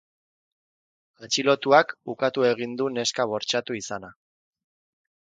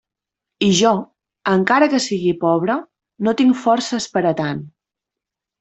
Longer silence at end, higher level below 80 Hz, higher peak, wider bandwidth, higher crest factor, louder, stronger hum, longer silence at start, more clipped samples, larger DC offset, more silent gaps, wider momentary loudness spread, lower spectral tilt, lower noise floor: first, 1.3 s vs 0.9 s; second, -72 dBFS vs -60 dBFS; about the same, -2 dBFS vs -2 dBFS; first, 9.4 kHz vs 8.4 kHz; first, 24 dB vs 16 dB; second, -24 LUFS vs -18 LUFS; neither; first, 1.2 s vs 0.6 s; neither; neither; neither; first, 13 LU vs 9 LU; second, -3 dB/octave vs -4.5 dB/octave; first, under -90 dBFS vs -85 dBFS